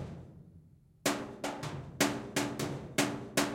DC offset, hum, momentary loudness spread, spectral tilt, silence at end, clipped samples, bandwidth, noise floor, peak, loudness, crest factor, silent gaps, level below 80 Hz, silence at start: under 0.1%; none; 11 LU; -3.5 dB/octave; 0 s; under 0.1%; 16.5 kHz; -59 dBFS; -12 dBFS; -35 LUFS; 24 dB; none; -62 dBFS; 0 s